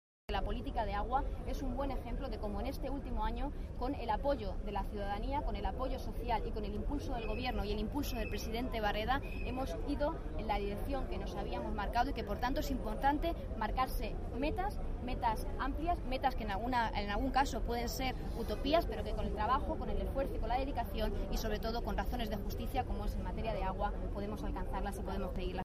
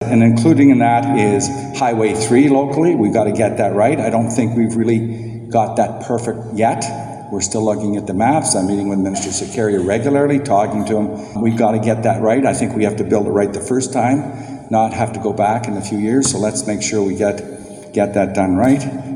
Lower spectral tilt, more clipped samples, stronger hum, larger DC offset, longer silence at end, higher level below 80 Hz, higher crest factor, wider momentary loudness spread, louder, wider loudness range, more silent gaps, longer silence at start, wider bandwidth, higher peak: about the same, -6 dB/octave vs -5.5 dB/octave; neither; neither; neither; about the same, 0 s vs 0 s; first, -40 dBFS vs -50 dBFS; about the same, 18 dB vs 16 dB; about the same, 6 LU vs 8 LU; second, -38 LUFS vs -16 LUFS; about the same, 3 LU vs 3 LU; neither; first, 0.3 s vs 0 s; first, 15.5 kHz vs 11.5 kHz; second, -18 dBFS vs 0 dBFS